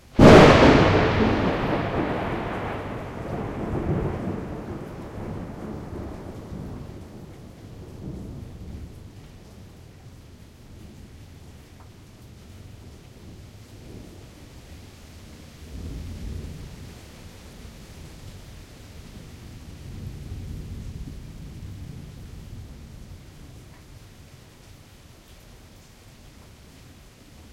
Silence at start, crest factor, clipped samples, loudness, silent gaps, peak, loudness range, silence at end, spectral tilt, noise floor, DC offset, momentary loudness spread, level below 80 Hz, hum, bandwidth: 0.15 s; 24 dB; under 0.1%; -21 LUFS; none; -2 dBFS; 19 LU; 0.1 s; -6.5 dB/octave; -49 dBFS; under 0.1%; 24 LU; -40 dBFS; none; 15.5 kHz